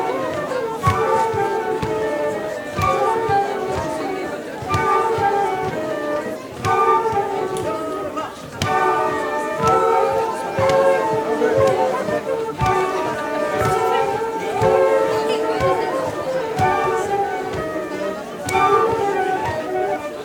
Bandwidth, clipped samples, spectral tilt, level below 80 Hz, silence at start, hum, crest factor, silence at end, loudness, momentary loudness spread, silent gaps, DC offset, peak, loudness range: 19.5 kHz; under 0.1%; -5.5 dB/octave; -46 dBFS; 0 s; none; 18 dB; 0 s; -20 LUFS; 9 LU; none; under 0.1%; -2 dBFS; 3 LU